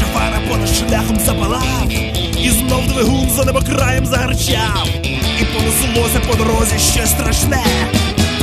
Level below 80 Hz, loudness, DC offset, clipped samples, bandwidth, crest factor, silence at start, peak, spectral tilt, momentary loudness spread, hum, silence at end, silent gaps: -22 dBFS; -14 LUFS; under 0.1%; under 0.1%; 14.5 kHz; 14 dB; 0 s; 0 dBFS; -4 dB/octave; 3 LU; none; 0 s; none